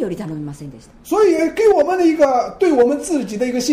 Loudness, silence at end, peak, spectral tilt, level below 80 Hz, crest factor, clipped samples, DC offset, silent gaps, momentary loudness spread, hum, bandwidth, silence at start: -16 LUFS; 0 s; -4 dBFS; -5 dB/octave; -48 dBFS; 12 dB; under 0.1%; under 0.1%; none; 14 LU; none; 15.5 kHz; 0 s